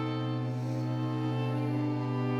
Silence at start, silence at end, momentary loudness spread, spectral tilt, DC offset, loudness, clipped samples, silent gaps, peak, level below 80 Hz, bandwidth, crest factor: 0 s; 0 s; 2 LU; -8.5 dB/octave; under 0.1%; -32 LUFS; under 0.1%; none; -20 dBFS; -70 dBFS; 7.2 kHz; 10 dB